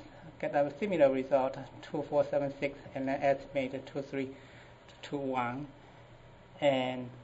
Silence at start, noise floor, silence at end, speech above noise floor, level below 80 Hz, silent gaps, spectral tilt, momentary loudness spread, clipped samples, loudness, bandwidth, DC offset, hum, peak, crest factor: 0 s; -55 dBFS; 0 s; 22 dB; -64 dBFS; none; -6.5 dB/octave; 17 LU; under 0.1%; -33 LUFS; 8 kHz; under 0.1%; none; -14 dBFS; 20 dB